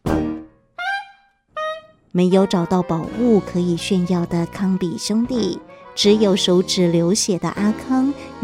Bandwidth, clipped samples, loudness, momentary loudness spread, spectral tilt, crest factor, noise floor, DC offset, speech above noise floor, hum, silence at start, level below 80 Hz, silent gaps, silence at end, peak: 15 kHz; under 0.1%; -19 LUFS; 12 LU; -5 dB/octave; 16 dB; -51 dBFS; under 0.1%; 33 dB; none; 0.05 s; -46 dBFS; none; 0 s; -2 dBFS